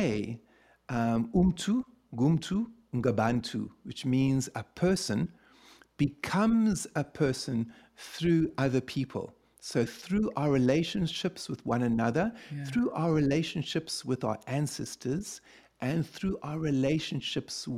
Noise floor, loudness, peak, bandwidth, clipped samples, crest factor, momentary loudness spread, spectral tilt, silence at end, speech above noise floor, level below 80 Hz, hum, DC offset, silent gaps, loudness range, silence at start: -58 dBFS; -30 LUFS; -12 dBFS; 15 kHz; under 0.1%; 18 dB; 10 LU; -6 dB/octave; 0 s; 29 dB; -54 dBFS; none; under 0.1%; none; 3 LU; 0 s